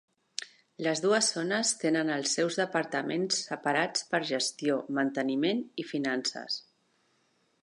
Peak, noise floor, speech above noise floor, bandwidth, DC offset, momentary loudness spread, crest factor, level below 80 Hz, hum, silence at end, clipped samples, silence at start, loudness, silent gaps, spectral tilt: -10 dBFS; -72 dBFS; 42 dB; 11.5 kHz; under 0.1%; 9 LU; 20 dB; -84 dBFS; none; 1.05 s; under 0.1%; 0.4 s; -29 LUFS; none; -3 dB/octave